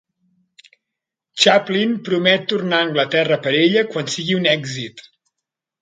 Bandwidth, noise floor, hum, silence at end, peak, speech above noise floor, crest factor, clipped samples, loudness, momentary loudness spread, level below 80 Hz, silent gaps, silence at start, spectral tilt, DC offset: 9.6 kHz; -83 dBFS; none; 0.8 s; 0 dBFS; 65 dB; 20 dB; under 0.1%; -17 LUFS; 10 LU; -66 dBFS; none; 1.35 s; -4 dB/octave; under 0.1%